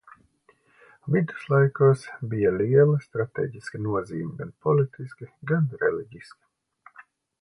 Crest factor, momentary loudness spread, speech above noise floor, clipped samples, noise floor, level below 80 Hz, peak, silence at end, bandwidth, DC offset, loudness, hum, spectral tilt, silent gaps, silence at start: 18 dB; 15 LU; 39 dB; under 0.1%; -63 dBFS; -60 dBFS; -8 dBFS; 1.2 s; 11 kHz; under 0.1%; -24 LUFS; none; -9 dB/octave; none; 1.05 s